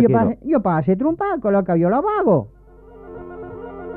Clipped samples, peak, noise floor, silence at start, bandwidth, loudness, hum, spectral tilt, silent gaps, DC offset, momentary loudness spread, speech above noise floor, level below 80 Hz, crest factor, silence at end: under 0.1%; -4 dBFS; -43 dBFS; 0 s; 4 kHz; -18 LUFS; none; -12 dB/octave; none; under 0.1%; 18 LU; 26 dB; -48 dBFS; 16 dB; 0 s